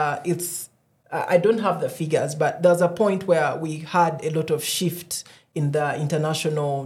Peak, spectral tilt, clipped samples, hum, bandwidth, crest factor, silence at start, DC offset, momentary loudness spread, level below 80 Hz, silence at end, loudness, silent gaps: -6 dBFS; -5 dB/octave; under 0.1%; none; 16.5 kHz; 18 dB; 0 s; under 0.1%; 11 LU; -70 dBFS; 0 s; -23 LUFS; none